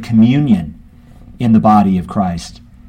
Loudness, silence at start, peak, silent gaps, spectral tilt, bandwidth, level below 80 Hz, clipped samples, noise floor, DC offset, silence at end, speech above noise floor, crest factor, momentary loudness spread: -13 LUFS; 0 s; 0 dBFS; none; -8 dB/octave; 9.6 kHz; -38 dBFS; under 0.1%; -39 dBFS; under 0.1%; 0.4 s; 27 dB; 14 dB; 17 LU